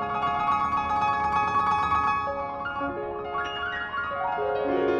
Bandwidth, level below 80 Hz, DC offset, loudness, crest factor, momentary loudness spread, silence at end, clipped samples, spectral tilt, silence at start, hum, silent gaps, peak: 9.8 kHz; -50 dBFS; under 0.1%; -26 LUFS; 12 dB; 7 LU; 0 s; under 0.1%; -5.5 dB/octave; 0 s; none; none; -14 dBFS